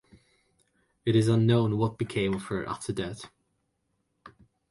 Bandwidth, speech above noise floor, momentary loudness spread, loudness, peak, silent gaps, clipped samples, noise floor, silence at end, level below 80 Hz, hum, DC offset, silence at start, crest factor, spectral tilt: 11.5 kHz; 50 dB; 13 LU; -27 LUFS; -10 dBFS; none; under 0.1%; -77 dBFS; 0.4 s; -58 dBFS; none; under 0.1%; 1.05 s; 18 dB; -7 dB/octave